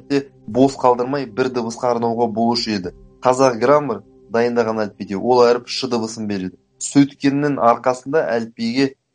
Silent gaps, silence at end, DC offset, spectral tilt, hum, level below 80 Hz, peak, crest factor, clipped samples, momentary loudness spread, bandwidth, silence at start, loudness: none; 0.2 s; under 0.1%; -5 dB/octave; none; -56 dBFS; 0 dBFS; 18 dB; under 0.1%; 10 LU; 10 kHz; 0.1 s; -18 LUFS